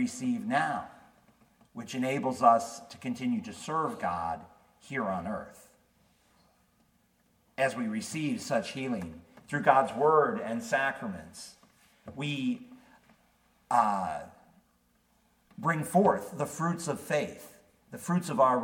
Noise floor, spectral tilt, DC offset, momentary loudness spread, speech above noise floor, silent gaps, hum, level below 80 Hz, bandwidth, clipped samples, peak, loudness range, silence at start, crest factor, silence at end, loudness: -69 dBFS; -5.5 dB/octave; under 0.1%; 19 LU; 40 dB; none; none; -68 dBFS; 18 kHz; under 0.1%; -8 dBFS; 8 LU; 0 s; 24 dB; 0 s; -30 LUFS